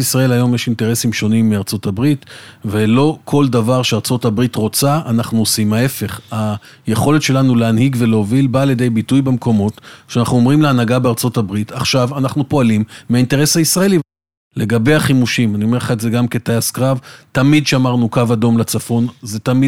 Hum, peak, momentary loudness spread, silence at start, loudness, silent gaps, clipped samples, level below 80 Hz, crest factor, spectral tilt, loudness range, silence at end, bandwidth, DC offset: none; 0 dBFS; 8 LU; 0 s; -15 LUFS; 14.37-14.51 s; under 0.1%; -48 dBFS; 14 dB; -5.5 dB/octave; 1 LU; 0 s; 17 kHz; under 0.1%